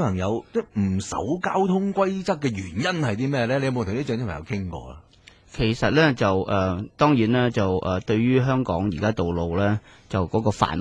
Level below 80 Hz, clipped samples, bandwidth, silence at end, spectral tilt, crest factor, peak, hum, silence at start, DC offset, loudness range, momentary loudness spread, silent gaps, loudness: -46 dBFS; under 0.1%; 10.5 kHz; 0 s; -6.5 dB/octave; 20 dB; -4 dBFS; none; 0 s; under 0.1%; 5 LU; 9 LU; none; -23 LUFS